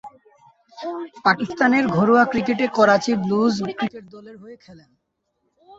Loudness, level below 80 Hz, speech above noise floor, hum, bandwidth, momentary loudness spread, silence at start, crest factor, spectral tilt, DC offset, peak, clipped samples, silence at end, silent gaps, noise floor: -19 LUFS; -60 dBFS; 53 dB; none; 7.8 kHz; 15 LU; 0.05 s; 18 dB; -6 dB/octave; under 0.1%; -2 dBFS; under 0.1%; 0.05 s; none; -72 dBFS